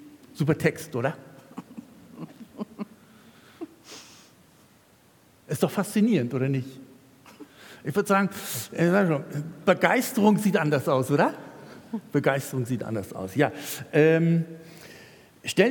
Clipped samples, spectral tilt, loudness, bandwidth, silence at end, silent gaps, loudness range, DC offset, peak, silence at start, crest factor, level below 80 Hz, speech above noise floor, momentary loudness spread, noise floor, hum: under 0.1%; -6 dB/octave; -25 LUFS; 18 kHz; 0 s; none; 19 LU; under 0.1%; -4 dBFS; 0 s; 24 dB; -70 dBFS; 34 dB; 23 LU; -58 dBFS; none